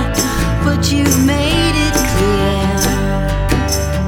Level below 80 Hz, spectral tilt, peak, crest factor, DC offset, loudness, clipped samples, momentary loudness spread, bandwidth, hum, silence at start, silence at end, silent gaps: -22 dBFS; -4.5 dB/octave; 0 dBFS; 14 dB; under 0.1%; -14 LUFS; under 0.1%; 4 LU; 18 kHz; none; 0 s; 0 s; none